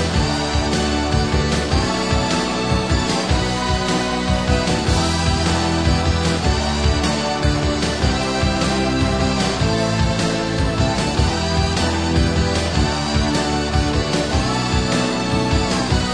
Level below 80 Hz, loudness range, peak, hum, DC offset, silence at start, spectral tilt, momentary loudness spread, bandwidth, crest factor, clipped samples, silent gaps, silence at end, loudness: -26 dBFS; 1 LU; -4 dBFS; none; 0.5%; 0 s; -5 dB/octave; 1 LU; 10.5 kHz; 14 dB; under 0.1%; none; 0 s; -19 LUFS